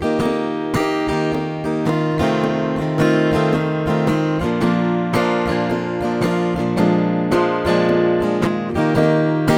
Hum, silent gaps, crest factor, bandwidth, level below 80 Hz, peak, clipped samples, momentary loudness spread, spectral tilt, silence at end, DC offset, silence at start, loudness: none; none; 16 dB; 16.5 kHz; -42 dBFS; -2 dBFS; under 0.1%; 4 LU; -7 dB/octave; 0 s; under 0.1%; 0 s; -18 LUFS